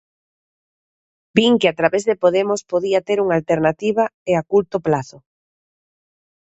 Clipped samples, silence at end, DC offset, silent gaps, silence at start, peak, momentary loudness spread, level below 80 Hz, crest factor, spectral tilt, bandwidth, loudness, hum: under 0.1%; 1.4 s; under 0.1%; 4.14-4.26 s; 1.35 s; 0 dBFS; 5 LU; -56 dBFS; 20 dB; -5.5 dB/octave; 8.2 kHz; -18 LUFS; none